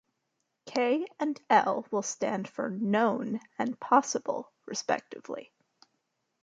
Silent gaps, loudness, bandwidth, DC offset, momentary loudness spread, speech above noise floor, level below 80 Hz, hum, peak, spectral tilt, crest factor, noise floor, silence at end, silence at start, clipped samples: none; -30 LUFS; 9.4 kHz; under 0.1%; 12 LU; 51 dB; -80 dBFS; none; -8 dBFS; -4 dB/octave; 22 dB; -81 dBFS; 1 s; 0.65 s; under 0.1%